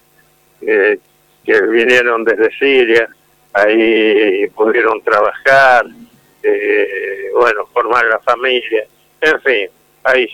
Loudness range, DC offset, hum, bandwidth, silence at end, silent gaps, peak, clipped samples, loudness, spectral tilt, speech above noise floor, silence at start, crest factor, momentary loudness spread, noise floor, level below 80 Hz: 3 LU; under 0.1%; none; 14 kHz; 0 s; none; 0 dBFS; under 0.1%; -12 LUFS; -4 dB/octave; 40 dB; 0.6 s; 12 dB; 10 LU; -52 dBFS; -56 dBFS